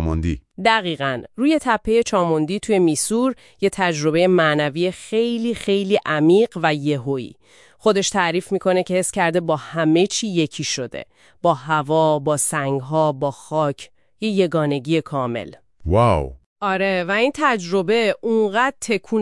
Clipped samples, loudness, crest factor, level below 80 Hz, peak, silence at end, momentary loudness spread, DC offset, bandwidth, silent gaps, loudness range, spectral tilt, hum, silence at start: under 0.1%; -19 LUFS; 18 dB; -44 dBFS; -2 dBFS; 0 s; 8 LU; 0.1%; 12 kHz; 16.46-16.56 s; 3 LU; -5 dB/octave; none; 0 s